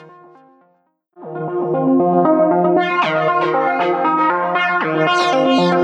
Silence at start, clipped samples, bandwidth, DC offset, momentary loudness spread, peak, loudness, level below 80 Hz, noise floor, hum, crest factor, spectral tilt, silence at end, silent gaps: 0 s; under 0.1%; 9.2 kHz; under 0.1%; 5 LU; -2 dBFS; -15 LUFS; -68 dBFS; -61 dBFS; none; 14 dB; -6 dB/octave; 0 s; none